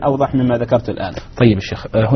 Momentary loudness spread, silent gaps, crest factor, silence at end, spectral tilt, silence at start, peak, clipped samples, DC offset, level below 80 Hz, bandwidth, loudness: 10 LU; none; 16 dB; 0 s; -7 dB/octave; 0 s; 0 dBFS; under 0.1%; under 0.1%; -38 dBFS; 6.4 kHz; -17 LUFS